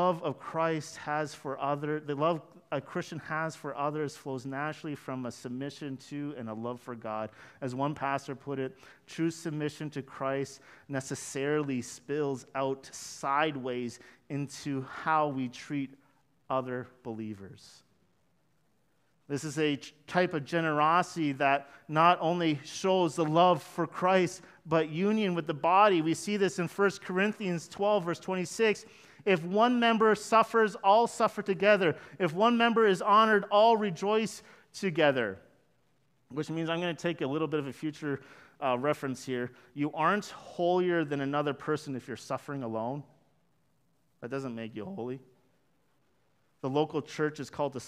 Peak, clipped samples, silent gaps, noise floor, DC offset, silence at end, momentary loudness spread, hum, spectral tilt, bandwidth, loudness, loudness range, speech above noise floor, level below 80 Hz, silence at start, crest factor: -8 dBFS; under 0.1%; none; -73 dBFS; under 0.1%; 0 s; 15 LU; none; -5.5 dB/octave; 15 kHz; -30 LUFS; 12 LU; 43 dB; -76 dBFS; 0 s; 22 dB